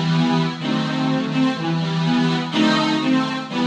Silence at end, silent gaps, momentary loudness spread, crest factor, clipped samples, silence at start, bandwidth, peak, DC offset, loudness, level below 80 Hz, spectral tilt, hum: 0 s; none; 4 LU; 14 dB; under 0.1%; 0 s; 9.2 kHz; -6 dBFS; under 0.1%; -20 LUFS; -62 dBFS; -6 dB/octave; none